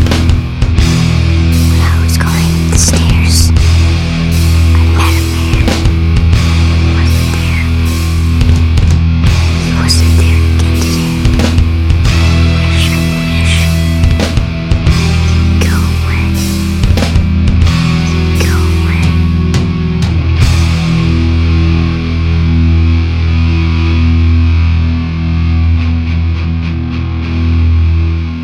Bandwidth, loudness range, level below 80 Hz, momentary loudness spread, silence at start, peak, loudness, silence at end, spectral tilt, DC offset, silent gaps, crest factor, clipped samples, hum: 15 kHz; 2 LU; -14 dBFS; 4 LU; 0 s; 0 dBFS; -11 LUFS; 0 s; -5.5 dB/octave; under 0.1%; none; 8 dB; under 0.1%; none